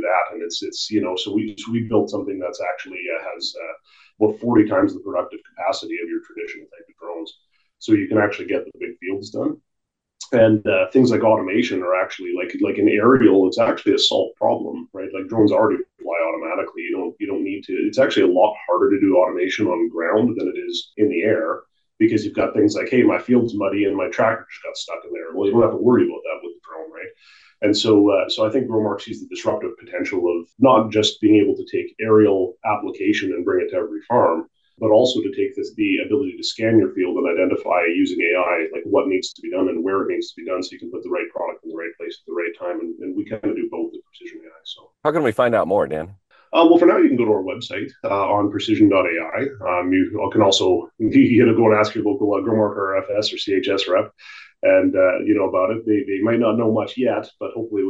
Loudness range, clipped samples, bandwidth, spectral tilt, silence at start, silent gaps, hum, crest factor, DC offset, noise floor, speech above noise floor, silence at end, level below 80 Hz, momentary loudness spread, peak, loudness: 7 LU; under 0.1%; 8 kHz; -5.5 dB/octave; 0 s; none; none; 18 dB; under 0.1%; -79 dBFS; 60 dB; 0 s; -62 dBFS; 14 LU; -2 dBFS; -19 LUFS